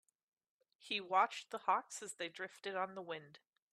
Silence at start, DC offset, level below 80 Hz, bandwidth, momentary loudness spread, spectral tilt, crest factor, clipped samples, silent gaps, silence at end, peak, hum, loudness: 0.85 s; under 0.1%; under -90 dBFS; 13.5 kHz; 13 LU; -2 dB/octave; 22 dB; under 0.1%; none; 0.35 s; -20 dBFS; none; -40 LUFS